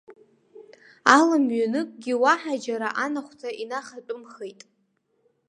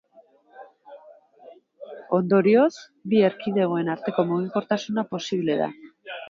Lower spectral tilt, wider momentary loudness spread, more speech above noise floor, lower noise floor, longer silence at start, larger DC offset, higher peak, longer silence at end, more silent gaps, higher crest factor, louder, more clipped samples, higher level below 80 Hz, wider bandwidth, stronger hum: second, -3 dB/octave vs -7 dB/octave; about the same, 20 LU vs 18 LU; first, 47 dB vs 34 dB; first, -71 dBFS vs -56 dBFS; second, 0.1 s vs 0.55 s; neither; first, 0 dBFS vs -8 dBFS; first, 1 s vs 0 s; neither; first, 26 dB vs 16 dB; about the same, -23 LUFS vs -23 LUFS; neither; about the same, -76 dBFS vs -72 dBFS; first, 11.5 kHz vs 7.4 kHz; neither